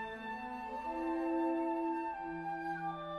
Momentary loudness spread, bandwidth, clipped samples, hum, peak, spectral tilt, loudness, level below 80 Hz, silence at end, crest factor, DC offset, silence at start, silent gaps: 8 LU; 6.6 kHz; under 0.1%; none; -26 dBFS; -7 dB/octave; -38 LUFS; -66 dBFS; 0 s; 12 dB; under 0.1%; 0 s; none